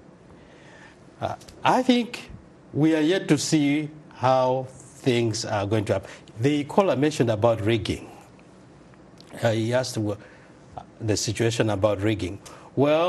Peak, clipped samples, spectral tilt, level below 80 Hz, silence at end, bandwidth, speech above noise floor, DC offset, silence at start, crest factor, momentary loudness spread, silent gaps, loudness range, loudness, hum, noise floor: -4 dBFS; under 0.1%; -5.5 dB/octave; -56 dBFS; 0 s; 12.5 kHz; 26 dB; under 0.1%; 0.8 s; 22 dB; 16 LU; none; 5 LU; -24 LUFS; none; -49 dBFS